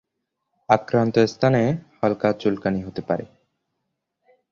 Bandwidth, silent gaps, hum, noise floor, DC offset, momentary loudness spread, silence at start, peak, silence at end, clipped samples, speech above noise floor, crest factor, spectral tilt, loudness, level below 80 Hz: 7.2 kHz; none; none; -79 dBFS; under 0.1%; 8 LU; 0.7 s; -2 dBFS; 1.3 s; under 0.1%; 58 dB; 22 dB; -7.5 dB/octave; -22 LUFS; -56 dBFS